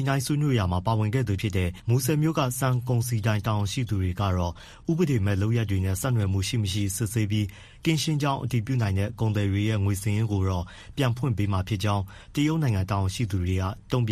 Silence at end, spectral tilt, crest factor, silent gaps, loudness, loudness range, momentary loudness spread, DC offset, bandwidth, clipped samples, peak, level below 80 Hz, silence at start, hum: 0 s; -6 dB/octave; 16 dB; none; -26 LUFS; 1 LU; 4 LU; under 0.1%; 14.5 kHz; under 0.1%; -10 dBFS; -48 dBFS; 0 s; none